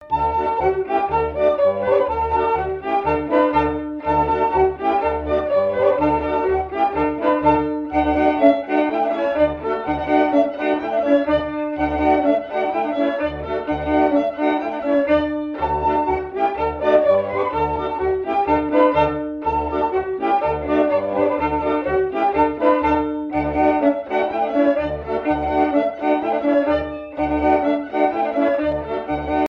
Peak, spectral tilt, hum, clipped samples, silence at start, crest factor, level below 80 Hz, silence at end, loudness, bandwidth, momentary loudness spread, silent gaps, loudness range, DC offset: 0 dBFS; -8 dB/octave; none; under 0.1%; 0 s; 18 dB; -40 dBFS; 0 s; -19 LUFS; 5.8 kHz; 6 LU; none; 1 LU; under 0.1%